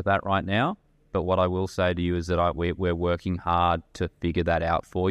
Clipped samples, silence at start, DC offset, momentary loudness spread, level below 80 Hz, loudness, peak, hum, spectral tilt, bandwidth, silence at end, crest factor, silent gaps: under 0.1%; 0 s; under 0.1%; 6 LU; -42 dBFS; -26 LUFS; -10 dBFS; none; -7 dB/octave; 11.5 kHz; 0 s; 16 dB; none